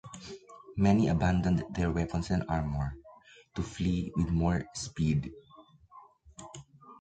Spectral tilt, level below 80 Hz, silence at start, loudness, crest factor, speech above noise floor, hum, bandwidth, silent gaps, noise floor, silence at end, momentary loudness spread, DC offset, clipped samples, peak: -7 dB/octave; -44 dBFS; 0.05 s; -30 LUFS; 18 dB; 28 dB; none; 9 kHz; none; -57 dBFS; 0.05 s; 21 LU; under 0.1%; under 0.1%; -14 dBFS